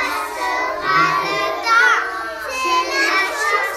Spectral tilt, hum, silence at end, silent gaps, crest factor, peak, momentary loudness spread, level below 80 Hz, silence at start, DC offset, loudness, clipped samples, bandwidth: -1.5 dB/octave; none; 0 s; none; 16 dB; -2 dBFS; 8 LU; -52 dBFS; 0 s; under 0.1%; -17 LUFS; under 0.1%; 16 kHz